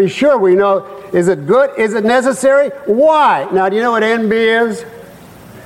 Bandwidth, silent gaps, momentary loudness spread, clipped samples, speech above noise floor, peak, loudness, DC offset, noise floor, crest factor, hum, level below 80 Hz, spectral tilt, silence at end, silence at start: 16 kHz; none; 6 LU; under 0.1%; 24 dB; -2 dBFS; -12 LUFS; under 0.1%; -36 dBFS; 10 dB; none; -54 dBFS; -5 dB/octave; 0.05 s; 0 s